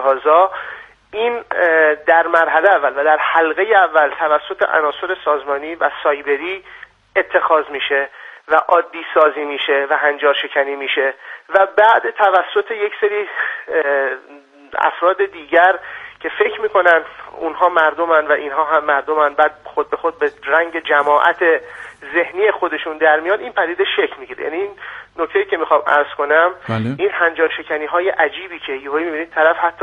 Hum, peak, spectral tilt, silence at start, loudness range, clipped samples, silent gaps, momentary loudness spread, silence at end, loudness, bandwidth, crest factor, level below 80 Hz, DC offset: none; 0 dBFS; -6 dB/octave; 0 s; 4 LU; under 0.1%; none; 11 LU; 0 s; -16 LUFS; 6.6 kHz; 16 dB; -60 dBFS; under 0.1%